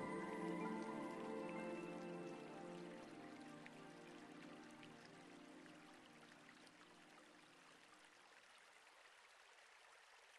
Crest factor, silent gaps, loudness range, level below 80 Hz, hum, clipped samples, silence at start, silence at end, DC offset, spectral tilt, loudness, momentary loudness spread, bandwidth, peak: 20 dB; none; 14 LU; -88 dBFS; none; under 0.1%; 0 s; 0 s; under 0.1%; -5.5 dB/octave; -54 LUFS; 17 LU; 12 kHz; -36 dBFS